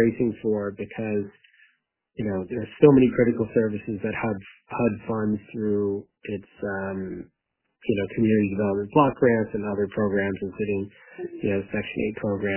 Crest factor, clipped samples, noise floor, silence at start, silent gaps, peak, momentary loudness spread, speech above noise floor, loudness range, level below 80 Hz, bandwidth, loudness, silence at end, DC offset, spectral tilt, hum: 24 dB; under 0.1%; -69 dBFS; 0 s; none; -2 dBFS; 15 LU; 45 dB; 6 LU; -54 dBFS; 3.2 kHz; -25 LUFS; 0 s; under 0.1%; -11.5 dB/octave; none